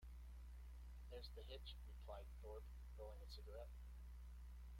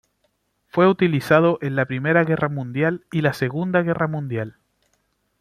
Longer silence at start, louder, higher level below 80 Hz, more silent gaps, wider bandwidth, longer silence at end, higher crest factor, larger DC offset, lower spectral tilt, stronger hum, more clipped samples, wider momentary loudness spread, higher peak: second, 0 s vs 0.75 s; second, -59 LUFS vs -20 LUFS; about the same, -56 dBFS vs -60 dBFS; neither; first, 16.5 kHz vs 14.5 kHz; second, 0 s vs 0.9 s; about the same, 14 dB vs 18 dB; neither; second, -5.5 dB/octave vs -8 dB/octave; first, 60 Hz at -55 dBFS vs none; neither; second, 4 LU vs 10 LU; second, -42 dBFS vs -4 dBFS